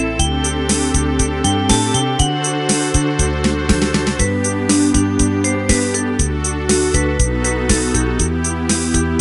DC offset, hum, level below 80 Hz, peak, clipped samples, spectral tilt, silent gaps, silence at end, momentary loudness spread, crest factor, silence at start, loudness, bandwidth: under 0.1%; none; -24 dBFS; 0 dBFS; under 0.1%; -4 dB/octave; none; 0 s; 3 LU; 16 dB; 0 s; -16 LUFS; 12 kHz